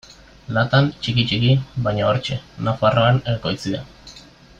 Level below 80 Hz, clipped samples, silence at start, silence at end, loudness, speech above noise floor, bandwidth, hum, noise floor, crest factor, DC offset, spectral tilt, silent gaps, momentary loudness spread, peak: -46 dBFS; under 0.1%; 0.5 s; 0.4 s; -20 LUFS; 25 dB; 7.8 kHz; none; -44 dBFS; 16 dB; under 0.1%; -6.5 dB/octave; none; 10 LU; -4 dBFS